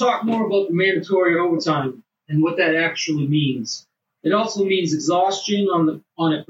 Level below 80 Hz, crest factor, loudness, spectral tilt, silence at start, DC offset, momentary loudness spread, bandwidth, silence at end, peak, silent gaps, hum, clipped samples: -74 dBFS; 14 dB; -20 LUFS; -5 dB/octave; 0 s; under 0.1%; 6 LU; 8 kHz; 0.05 s; -6 dBFS; none; none; under 0.1%